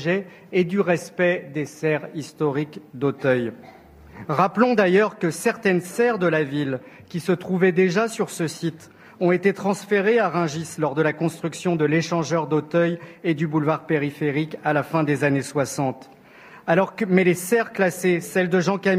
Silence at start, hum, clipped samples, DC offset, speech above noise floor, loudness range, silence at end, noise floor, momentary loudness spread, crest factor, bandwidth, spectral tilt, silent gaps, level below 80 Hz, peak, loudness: 0 s; none; under 0.1%; under 0.1%; 25 dB; 3 LU; 0 s; -47 dBFS; 8 LU; 20 dB; 15.5 kHz; -6 dB/octave; none; -64 dBFS; -2 dBFS; -22 LUFS